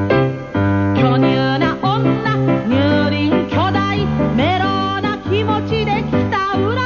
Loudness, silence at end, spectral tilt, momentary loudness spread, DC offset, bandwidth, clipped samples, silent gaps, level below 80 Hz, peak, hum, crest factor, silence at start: -16 LUFS; 0 s; -7.5 dB/octave; 4 LU; 0.1%; 7 kHz; under 0.1%; none; -36 dBFS; -2 dBFS; none; 12 dB; 0 s